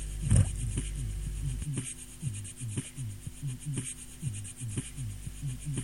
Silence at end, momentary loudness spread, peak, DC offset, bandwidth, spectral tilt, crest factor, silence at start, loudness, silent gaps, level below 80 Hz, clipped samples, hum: 0 s; 12 LU; -10 dBFS; 0.2%; 17 kHz; -5 dB/octave; 24 dB; 0 s; -35 LUFS; none; -40 dBFS; under 0.1%; none